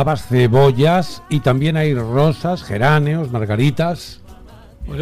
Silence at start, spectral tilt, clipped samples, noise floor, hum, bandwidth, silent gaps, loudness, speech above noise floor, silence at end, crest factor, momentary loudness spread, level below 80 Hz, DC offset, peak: 0 s; -7.5 dB/octave; under 0.1%; -40 dBFS; none; 14.5 kHz; none; -16 LUFS; 25 dB; 0 s; 12 dB; 9 LU; -40 dBFS; under 0.1%; -4 dBFS